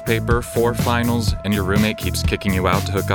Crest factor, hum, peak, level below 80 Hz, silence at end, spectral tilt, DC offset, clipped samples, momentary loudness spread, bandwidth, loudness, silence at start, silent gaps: 16 dB; none; -2 dBFS; -30 dBFS; 0 s; -5.5 dB/octave; under 0.1%; under 0.1%; 3 LU; 20 kHz; -19 LUFS; 0 s; none